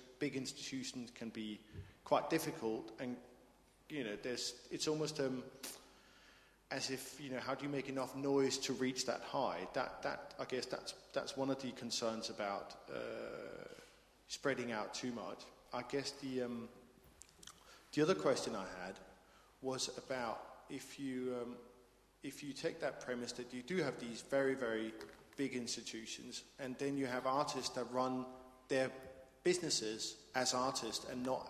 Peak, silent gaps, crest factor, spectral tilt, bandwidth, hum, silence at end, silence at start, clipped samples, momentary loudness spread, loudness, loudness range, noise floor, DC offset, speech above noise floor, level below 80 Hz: -20 dBFS; none; 22 dB; -3.5 dB/octave; 15.5 kHz; none; 0 s; 0 s; under 0.1%; 13 LU; -41 LUFS; 5 LU; -68 dBFS; under 0.1%; 27 dB; -72 dBFS